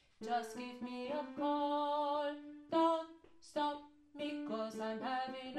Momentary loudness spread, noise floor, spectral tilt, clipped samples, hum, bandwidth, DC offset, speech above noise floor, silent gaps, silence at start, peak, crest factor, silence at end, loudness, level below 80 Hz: 11 LU; -59 dBFS; -4.5 dB/octave; under 0.1%; none; 13 kHz; under 0.1%; 20 dB; none; 0.2 s; -22 dBFS; 16 dB; 0 s; -39 LUFS; -80 dBFS